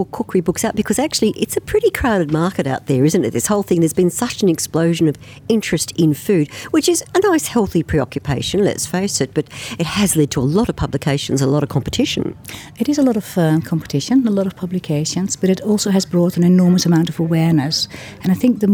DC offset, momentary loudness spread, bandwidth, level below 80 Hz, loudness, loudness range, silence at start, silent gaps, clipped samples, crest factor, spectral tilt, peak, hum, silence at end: under 0.1%; 6 LU; over 20 kHz; -42 dBFS; -17 LUFS; 3 LU; 0 s; none; under 0.1%; 14 dB; -5.5 dB/octave; -2 dBFS; none; 0 s